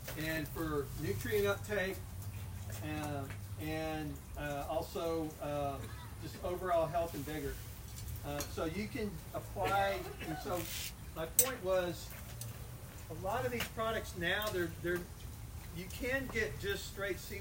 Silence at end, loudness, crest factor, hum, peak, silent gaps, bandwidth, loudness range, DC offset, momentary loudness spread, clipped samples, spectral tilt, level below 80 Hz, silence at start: 0 s; -38 LUFS; 28 dB; none; -10 dBFS; none; 16.5 kHz; 5 LU; under 0.1%; 12 LU; under 0.1%; -4 dB/octave; -52 dBFS; 0 s